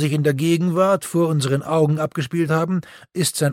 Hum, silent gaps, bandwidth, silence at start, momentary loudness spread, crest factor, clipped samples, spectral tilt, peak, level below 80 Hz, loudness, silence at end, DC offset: none; none; 16.5 kHz; 0 s; 5 LU; 14 dB; under 0.1%; -6 dB/octave; -6 dBFS; -62 dBFS; -20 LUFS; 0 s; under 0.1%